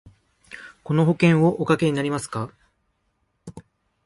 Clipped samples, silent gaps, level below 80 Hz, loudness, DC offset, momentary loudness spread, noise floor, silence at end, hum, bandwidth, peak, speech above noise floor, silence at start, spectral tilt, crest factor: under 0.1%; none; -58 dBFS; -21 LUFS; under 0.1%; 25 LU; -71 dBFS; 0.45 s; none; 11.5 kHz; -4 dBFS; 51 dB; 0.5 s; -7 dB/octave; 18 dB